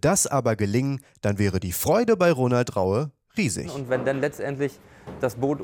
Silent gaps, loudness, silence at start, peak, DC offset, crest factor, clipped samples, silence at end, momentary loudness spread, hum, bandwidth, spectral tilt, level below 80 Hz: none; -24 LUFS; 0.05 s; -10 dBFS; under 0.1%; 14 dB; under 0.1%; 0 s; 10 LU; none; 17 kHz; -5.5 dB/octave; -54 dBFS